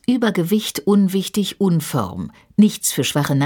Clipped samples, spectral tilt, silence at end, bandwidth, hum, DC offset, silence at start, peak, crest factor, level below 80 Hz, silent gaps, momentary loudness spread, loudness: under 0.1%; -5 dB/octave; 0 s; 19 kHz; none; under 0.1%; 0.1 s; -4 dBFS; 14 dB; -54 dBFS; none; 7 LU; -18 LUFS